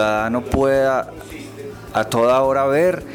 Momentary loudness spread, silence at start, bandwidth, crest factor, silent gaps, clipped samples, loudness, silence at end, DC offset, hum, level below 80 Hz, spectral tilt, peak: 18 LU; 0 s; 19.5 kHz; 12 dB; none; under 0.1%; -18 LUFS; 0 s; under 0.1%; none; -40 dBFS; -5.5 dB/octave; -6 dBFS